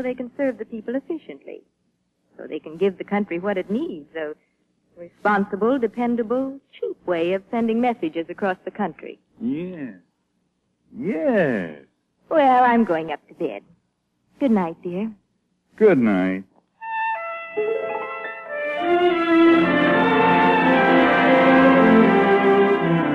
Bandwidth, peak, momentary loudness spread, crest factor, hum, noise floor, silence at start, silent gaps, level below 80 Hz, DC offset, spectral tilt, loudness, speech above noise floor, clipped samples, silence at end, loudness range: 6.8 kHz; -4 dBFS; 17 LU; 18 dB; none; -70 dBFS; 0 s; none; -62 dBFS; under 0.1%; -8 dB/octave; -20 LUFS; 48 dB; under 0.1%; 0 s; 12 LU